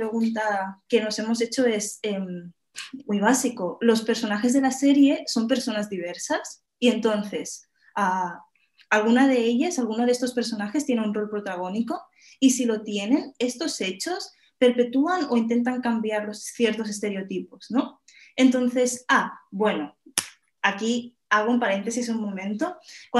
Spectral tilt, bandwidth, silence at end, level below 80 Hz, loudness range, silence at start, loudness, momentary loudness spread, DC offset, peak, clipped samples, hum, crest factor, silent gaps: -4 dB/octave; 12.5 kHz; 0 s; -72 dBFS; 3 LU; 0 s; -24 LUFS; 12 LU; under 0.1%; -2 dBFS; under 0.1%; none; 24 dB; none